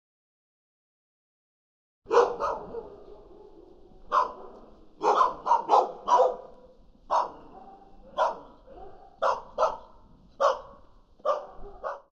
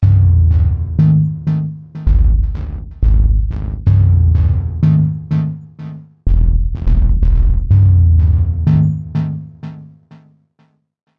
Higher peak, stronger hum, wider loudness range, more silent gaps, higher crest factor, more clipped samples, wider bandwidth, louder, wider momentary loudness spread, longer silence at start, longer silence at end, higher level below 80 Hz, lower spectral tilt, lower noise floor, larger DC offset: second, -8 dBFS vs -2 dBFS; neither; first, 6 LU vs 2 LU; neither; first, 22 dB vs 10 dB; neither; first, 8.2 kHz vs 3.1 kHz; second, -27 LUFS vs -14 LUFS; first, 22 LU vs 14 LU; first, 2.1 s vs 0 s; second, 0.15 s vs 1.35 s; second, -56 dBFS vs -16 dBFS; second, -3.5 dB/octave vs -11.5 dB/octave; about the same, -54 dBFS vs -57 dBFS; neither